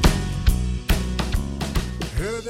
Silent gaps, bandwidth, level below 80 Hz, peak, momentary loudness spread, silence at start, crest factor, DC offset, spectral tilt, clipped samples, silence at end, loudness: none; 16.5 kHz; -24 dBFS; -4 dBFS; 4 LU; 0 s; 18 dB; under 0.1%; -5 dB/octave; under 0.1%; 0 s; -25 LUFS